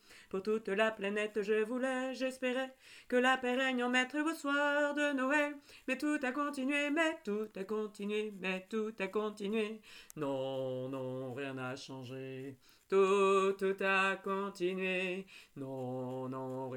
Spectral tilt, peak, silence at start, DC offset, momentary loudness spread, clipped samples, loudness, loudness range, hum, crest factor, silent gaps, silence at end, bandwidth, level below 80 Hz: -5 dB/octave; -18 dBFS; 0.1 s; under 0.1%; 13 LU; under 0.1%; -35 LUFS; 6 LU; none; 18 dB; none; 0 s; 18 kHz; -78 dBFS